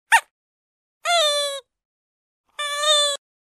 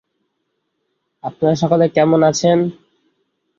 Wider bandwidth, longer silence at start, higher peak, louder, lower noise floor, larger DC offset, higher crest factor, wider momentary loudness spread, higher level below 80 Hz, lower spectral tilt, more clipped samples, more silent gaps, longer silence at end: first, 14 kHz vs 7.6 kHz; second, 0.1 s vs 1.25 s; about the same, -2 dBFS vs -2 dBFS; second, -20 LUFS vs -15 LUFS; first, under -90 dBFS vs -72 dBFS; neither; first, 22 dB vs 16 dB; about the same, 14 LU vs 13 LU; second, -88 dBFS vs -58 dBFS; second, 6 dB/octave vs -6 dB/octave; neither; first, 0.31-1.01 s, 1.85-2.44 s vs none; second, 0.3 s vs 0.85 s